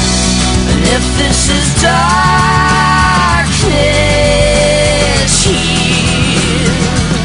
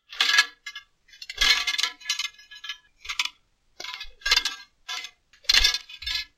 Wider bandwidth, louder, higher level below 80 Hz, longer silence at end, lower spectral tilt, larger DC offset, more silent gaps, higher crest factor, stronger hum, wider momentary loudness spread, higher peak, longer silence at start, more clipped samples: second, 11 kHz vs 16.5 kHz; first, -9 LUFS vs -23 LUFS; first, -18 dBFS vs -44 dBFS; second, 0 s vs 0.15 s; first, -4 dB/octave vs 2 dB/octave; neither; neither; second, 10 dB vs 26 dB; neither; second, 2 LU vs 20 LU; about the same, 0 dBFS vs -2 dBFS; about the same, 0 s vs 0.1 s; neither